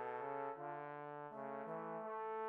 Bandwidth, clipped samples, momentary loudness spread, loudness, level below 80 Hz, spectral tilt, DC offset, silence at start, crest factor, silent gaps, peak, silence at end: 4.6 kHz; under 0.1%; 5 LU; -47 LUFS; under -90 dBFS; -5.5 dB/octave; under 0.1%; 0 s; 14 dB; none; -32 dBFS; 0 s